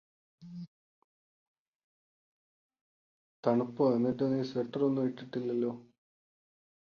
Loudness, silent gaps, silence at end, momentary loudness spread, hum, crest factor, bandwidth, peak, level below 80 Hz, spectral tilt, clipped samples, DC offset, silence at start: -32 LUFS; 0.67-2.69 s, 2.81-3.43 s; 1.05 s; 19 LU; none; 22 dB; 6.8 kHz; -14 dBFS; -76 dBFS; -9 dB/octave; under 0.1%; under 0.1%; 0.4 s